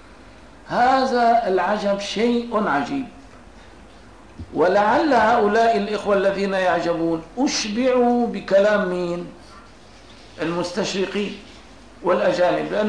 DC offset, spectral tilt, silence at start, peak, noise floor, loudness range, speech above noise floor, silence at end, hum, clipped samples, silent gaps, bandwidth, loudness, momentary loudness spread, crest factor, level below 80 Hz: 0.3%; -4.5 dB/octave; 0.1 s; -8 dBFS; -46 dBFS; 5 LU; 26 dB; 0 s; none; under 0.1%; none; 10.5 kHz; -20 LUFS; 11 LU; 12 dB; -50 dBFS